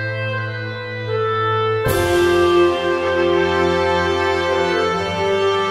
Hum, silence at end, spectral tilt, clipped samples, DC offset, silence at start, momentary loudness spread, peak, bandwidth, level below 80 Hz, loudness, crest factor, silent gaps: none; 0 s; -5.5 dB/octave; under 0.1%; under 0.1%; 0 s; 9 LU; -4 dBFS; 16 kHz; -42 dBFS; -18 LUFS; 12 dB; none